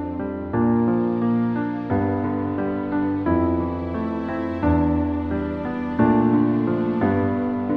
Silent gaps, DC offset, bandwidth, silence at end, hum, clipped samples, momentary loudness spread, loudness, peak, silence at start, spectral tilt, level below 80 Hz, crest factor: none; under 0.1%; 4.8 kHz; 0 s; none; under 0.1%; 7 LU; -22 LUFS; -6 dBFS; 0 s; -11 dB/octave; -40 dBFS; 16 dB